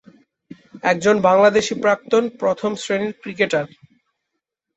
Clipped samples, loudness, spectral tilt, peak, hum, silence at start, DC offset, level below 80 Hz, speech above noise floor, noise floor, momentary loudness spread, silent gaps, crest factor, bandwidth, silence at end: under 0.1%; -18 LUFS; -4.5 dB/octave; -2 dBFS; none; 0.75 s; under 0.1%; -62 dBFS; 61 dB; -79 dBFS; 10 LU; none; 18 dB; 8.2 kHz; 1.1 s